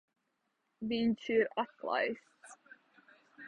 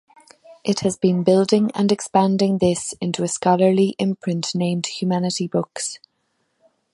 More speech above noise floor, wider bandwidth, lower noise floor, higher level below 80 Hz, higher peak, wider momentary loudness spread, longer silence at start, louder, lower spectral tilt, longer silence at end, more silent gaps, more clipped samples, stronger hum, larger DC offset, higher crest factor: about the same, 48 dB vs 51 dB; second, 10 kHz vs 11.5 kHz; first, -82 dBFS vs -70 dBFS; second, -74 dBFS vs -58 dBFS; second, -18 dBFS vs -2 dBFS; first, 14 LU vs 8 LU; first, 0.8 s vs 0.5 s; second, -34 LUFS vs -20 LUFS; about the same, -5.5 dB/octave vs -5.5 dB/octave; second, 0 s vs 1 s; neither; neither; neither; neither; about the same, 18 dB vs 18 dB